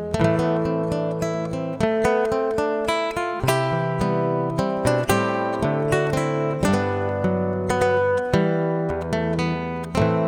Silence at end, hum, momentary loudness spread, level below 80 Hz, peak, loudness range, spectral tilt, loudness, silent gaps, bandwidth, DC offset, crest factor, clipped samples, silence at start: 0 s; none; 4 LU; -44 dBFS; -4 dBFS; 1 LU; -6.5 dB/octave; -22 LUFS; none; 18 kHz; under 0.1%; 18 dB; under 0.1%; 0 s